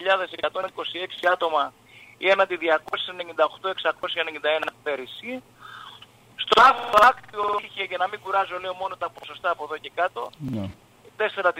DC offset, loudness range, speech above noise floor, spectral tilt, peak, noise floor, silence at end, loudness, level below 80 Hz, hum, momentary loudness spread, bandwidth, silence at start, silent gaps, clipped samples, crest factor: under 0.1%; 7 LU; 25 dB; -4 dB/octave; -6 dBFS; -49 dBFS; 0 s; -24 LUFS; -62 dBFS; none; 17 LU; 16 kHz; 0 s; none; under 0.1%; 20 dB